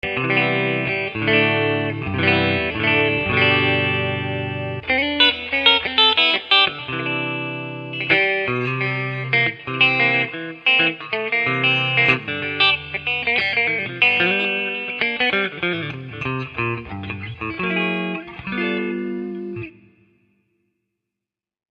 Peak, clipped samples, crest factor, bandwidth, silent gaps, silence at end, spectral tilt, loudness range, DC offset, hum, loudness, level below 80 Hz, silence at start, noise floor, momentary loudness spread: 0 dBFS; under 0.1%; 20 dB; 8 kHz; none; 2 s; -6.5 dB/octave; 9 LU; under 0.1%; none; -18 LUFS; -52 dBFS; 0.05 s; -87 dBFS; 13 LU